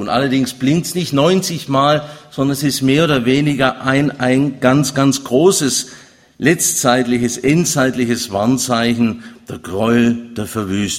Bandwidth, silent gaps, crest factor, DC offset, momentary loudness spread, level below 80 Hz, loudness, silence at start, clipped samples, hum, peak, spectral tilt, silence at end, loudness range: 16.5 kHz; none; 16 dB; under 0.1%; 7 LU; -48 dBFS; -15 LUFS; 0 s; under 0.1%; none; 0 dBFS; -4.5 dB/octave; 0 s; 2 LU